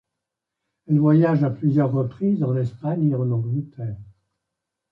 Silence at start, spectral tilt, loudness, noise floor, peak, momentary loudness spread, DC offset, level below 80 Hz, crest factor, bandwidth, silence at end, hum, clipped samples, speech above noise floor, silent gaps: 0.9 s; -11.5 dB/octave; -21 LUFS; -83 dBFS; -6 dBFS; 14 LU; under 0.1%; -58 dBFS; 16 dB; 5.2 kHz; 0.85 s; none; under 0.1%; 63 dB; none